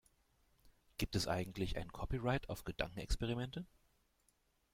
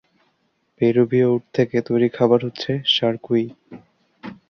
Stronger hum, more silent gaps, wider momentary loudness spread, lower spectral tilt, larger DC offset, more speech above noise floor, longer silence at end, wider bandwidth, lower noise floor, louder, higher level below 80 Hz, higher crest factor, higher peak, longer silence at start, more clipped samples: neither; neither; about the same, 8 LU vs 8 LU; second, -5 dB/octave vs -7 dB/octave; neither; second, 38 dB vs 48 dB; first, 1.05 s vs 0.15 s; first, 16.5 kHz vs 6.6 kHz; first, -78 dBFS vs -67 dBFS; second, -42 LUFS vs -19 LUFS; first, -50 dBFS vs -62 dBFS; about the same, 22 dB vs 18 dB; second, -20 dBFS vs -4 dBFS; second, 0.65 s vs 0.8 s; neither